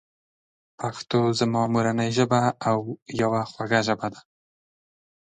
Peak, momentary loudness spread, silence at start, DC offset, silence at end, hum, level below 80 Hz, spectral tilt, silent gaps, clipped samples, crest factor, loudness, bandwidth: -6 dBFS; 10 LU; 0.8 s; under 0.1%; 1.2 s; none; -62 dBFS; -5.5 dB/octave; 3.02-3.06 s; under 0.1%; 20 dB; -24 LUFS; 9.6 kHz